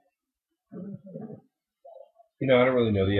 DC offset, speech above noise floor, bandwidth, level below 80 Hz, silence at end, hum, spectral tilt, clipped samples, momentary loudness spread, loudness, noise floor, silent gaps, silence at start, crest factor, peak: under 0.1%; 61 dB; 4.3 kHz; -50 dBFS; 0 s; none; -10.5 dB/octave; under 0.1%; 23 LU; -23 LUFS; -85 dBFS; none; 0.7 s; 18 dB; -10 dBFS